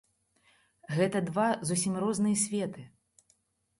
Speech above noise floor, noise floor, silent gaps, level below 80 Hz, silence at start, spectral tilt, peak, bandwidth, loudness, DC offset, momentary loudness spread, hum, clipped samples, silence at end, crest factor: 42 dB; -72 dBFS; none; -70 dBFS; 0.9 s; -5 dB/octave; -16 dBFS; 11.5 kHz; -30 LUFS; under 0.1%; 8 LU; none; under 0.1%; 0.95 s; 18 dB